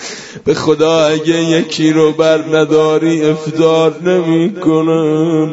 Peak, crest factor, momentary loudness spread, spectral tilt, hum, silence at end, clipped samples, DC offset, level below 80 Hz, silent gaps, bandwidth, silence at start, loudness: 0 dBFS; 12 dB; 4 LU; -6 dB/octave; none; 0 s; under 0.1%; under 0.1%; -52 dBFS; none; 8 kHz; 0 s; -12 LUFS